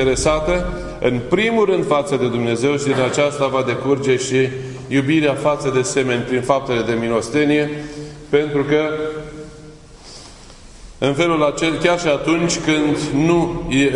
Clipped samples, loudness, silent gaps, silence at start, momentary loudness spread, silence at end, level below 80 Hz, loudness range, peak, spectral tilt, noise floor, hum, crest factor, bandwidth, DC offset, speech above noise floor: under 0.1%; -18 LUFS; none; 0 s; 10 LU; 0 s; -38 dBFS; 4 LU; 0 dBFS; -5 dB/octave; -40 dBFS; none; 18 dB; 11 kHz; under 0.1%; 23 dB